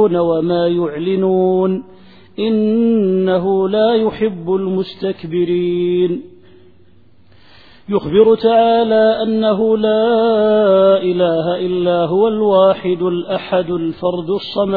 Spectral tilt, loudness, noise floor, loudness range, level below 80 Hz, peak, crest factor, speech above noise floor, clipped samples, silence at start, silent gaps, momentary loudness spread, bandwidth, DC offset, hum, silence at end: -10 dB/octave; -15 LUFS; -50 dBFS; 6 LU; -52 dBFS; 0 dBFS; 14 dB; 36 dB; under 0.1%; 0 s; none; 8 LU; 4.9 kHz; 0.5%; none; 0 s